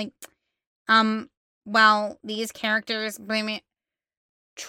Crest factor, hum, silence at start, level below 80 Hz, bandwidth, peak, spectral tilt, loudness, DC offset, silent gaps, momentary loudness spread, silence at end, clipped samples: 20 dB; none; 0 s; -74 dBFS; 17 kHz; -6 dBFS; -3 dB/octave; -23 LUFS; under 0.1%; 0.67-0.85 s, 1.37-1.61 s, 4.17-4.56 s; 14 LU; 0 s; under 0.1%